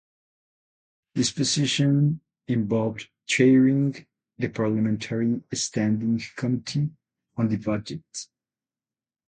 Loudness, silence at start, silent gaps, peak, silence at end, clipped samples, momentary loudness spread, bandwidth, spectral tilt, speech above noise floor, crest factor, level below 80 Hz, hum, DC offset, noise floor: -24 LUFS; 1.15 s; none; -6 dBFS; 1.05 s; under 0.1%; 15 LU; 9.4 kHz; -5.5 dB/octave; over 67 dB; 18 dB; -60 dBFS; none; under 0.1%; under -90 dBFS